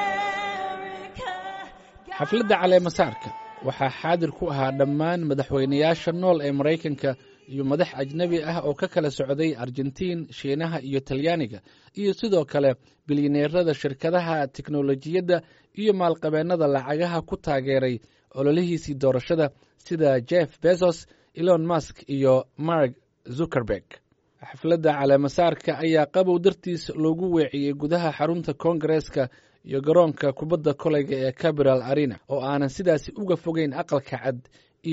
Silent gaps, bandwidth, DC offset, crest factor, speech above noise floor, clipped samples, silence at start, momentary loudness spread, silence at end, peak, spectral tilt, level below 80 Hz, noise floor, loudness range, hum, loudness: none; 8 kHz; under 0.1%; 18 dB; 21 dB; under 0.1%; 0 s; 10 LU; 0 s; -6 dBFS; -5.5 dB/octave; -56 dBFS; -44 dBFS; 3 LU; none; -24 LUFS